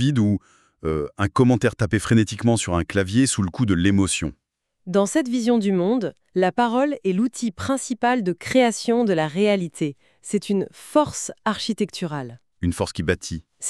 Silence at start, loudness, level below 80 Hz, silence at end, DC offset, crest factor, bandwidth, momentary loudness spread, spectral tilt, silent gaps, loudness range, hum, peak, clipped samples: 0 s; -22 LUFS; -46 dBFS; 0 s; under 0.1%; 16 dB; 13 kHz; 9 LU; -5.5 dB/octave; none; 4 LU; none; -6 dBFS; under 0.1%